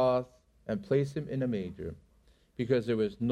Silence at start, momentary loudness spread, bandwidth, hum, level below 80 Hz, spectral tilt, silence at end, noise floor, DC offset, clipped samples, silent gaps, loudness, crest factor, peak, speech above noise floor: 0 s; 19 LU; 11.5 kHz; none; -60 dBFS; -8 dB/octave; 0 s; -65 dBFS; under 0.1%; under 0.1%; none; -32 LUFS; 18 dB; -14 dBFS; 33 dB